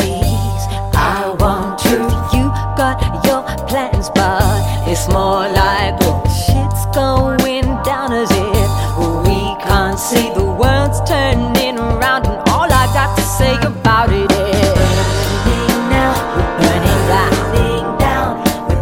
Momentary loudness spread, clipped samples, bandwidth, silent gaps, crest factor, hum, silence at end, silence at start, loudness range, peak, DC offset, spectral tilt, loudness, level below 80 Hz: 4 LU; under 0.1%; 17 kHz; none; 14 dB; none; 0 s; 0 s; 2 LU; 0 dBFS; under 0.1%; -5.5 dB/octave; -14 LUFS; -22 dBFS